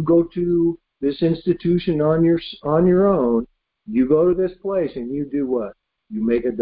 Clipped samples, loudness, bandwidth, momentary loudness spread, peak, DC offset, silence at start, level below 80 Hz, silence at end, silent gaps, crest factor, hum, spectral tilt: under 0.1%; -20 LUFS; 5 kHz; 9 LU; -4 dBFS; under 0.1%; 0 s; -48 dBFS; 0 s; none; 14 dB; none; -13 dB/octave